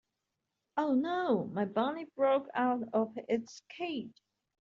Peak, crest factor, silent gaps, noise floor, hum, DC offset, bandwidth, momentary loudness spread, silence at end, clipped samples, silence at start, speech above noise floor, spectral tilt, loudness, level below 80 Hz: -18 dBFS; 16 dB; none; -86 dBFS; none; under 0.1%; 7.4 kHz; 10 LU; 0.55 s; under 0.1%; 0.75 s; 54 dB; -4.5 dB/octave; -33 LUFS; -78 dBFS